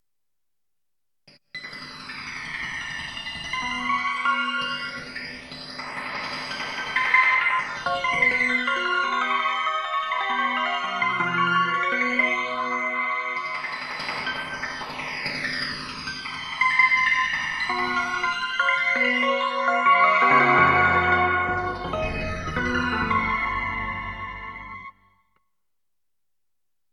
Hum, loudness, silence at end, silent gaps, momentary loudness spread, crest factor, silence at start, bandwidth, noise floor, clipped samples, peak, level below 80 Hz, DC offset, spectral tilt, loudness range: none; -23 LUFS; 2.05 s; none; 15 LU; 22 dB; 1.55 s; 12 kHz; -86 dBFS; under 0.1%; -4 dBFS; -48 dBFS; under 0.1%; -4 dB/octave; 10 LU